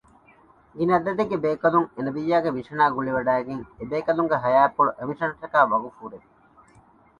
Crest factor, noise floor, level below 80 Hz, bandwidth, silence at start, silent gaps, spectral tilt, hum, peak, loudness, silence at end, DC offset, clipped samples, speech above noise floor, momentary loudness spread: 20 dB; -55 dBFS; -60 dBFS; 10 kHz; 0.75 s; none; -8 dB/octave; none; -4 dBFS; -23 LUFS; 1 s; under 0.1%; under 0.1%; 33 dB; 10 LU